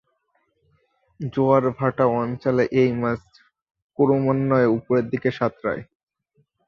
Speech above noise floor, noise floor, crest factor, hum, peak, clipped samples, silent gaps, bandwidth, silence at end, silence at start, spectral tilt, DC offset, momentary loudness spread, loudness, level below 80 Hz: 49 dB; -69 dBFS; 18 dB; none; -4 dBFS; under 0.1%; 3.62-3.66 s, 3.82-3.89 s; 6.8 kHz; 0.85 s; 1.2 s; -9 dB/octave; under 0.1%; 10 LU; -21 LUFS; -58 dBFS